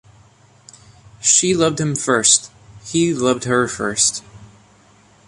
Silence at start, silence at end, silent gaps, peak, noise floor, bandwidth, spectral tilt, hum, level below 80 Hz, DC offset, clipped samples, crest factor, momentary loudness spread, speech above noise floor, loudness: 1.2 s; 0.8 s; none; 0 dBFS; -51 dBFS; 11.5 kHz; -2.5 dB/octave; none; -54 dBFS; under 0.1%; under 0.1%; 20 dB; 8 LU; 34 dB; -16 LUFS